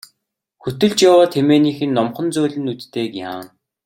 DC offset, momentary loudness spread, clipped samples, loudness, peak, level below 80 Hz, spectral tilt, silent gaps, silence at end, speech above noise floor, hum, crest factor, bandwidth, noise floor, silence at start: under 0.1%; 17 LU; under 0.1%; -16 LUFS; -2 dBFS; -58 dBFS; -5.5 dB/octave; none; 0.4 s; 57 dB; none; 16 dB; 17 kHz; -73 dBFS; 0.65 s